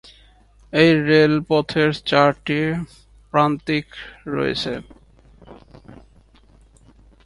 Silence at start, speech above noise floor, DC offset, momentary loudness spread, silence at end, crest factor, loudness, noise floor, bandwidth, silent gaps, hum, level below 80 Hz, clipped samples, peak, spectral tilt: 0.75 s; 33 dB; under 0.1%; 14 LU; 1.3 s; 20 dB; -19 LUFS; -52 dBFS; 11.5 kHz; none; none; -50 dBFS; under 0.1%; 0 dBFS; -6.5 dB/octave